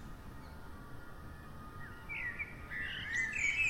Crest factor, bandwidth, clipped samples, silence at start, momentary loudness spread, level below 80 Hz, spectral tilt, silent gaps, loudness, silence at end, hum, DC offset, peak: 18 dB; 16 kHz; under 0.1%; 0 s; 18 LU; -54 dBFS; -2.5 dB/octave; none; -38 LUFS; 0 s; none; under 0.1%; -22 dBFS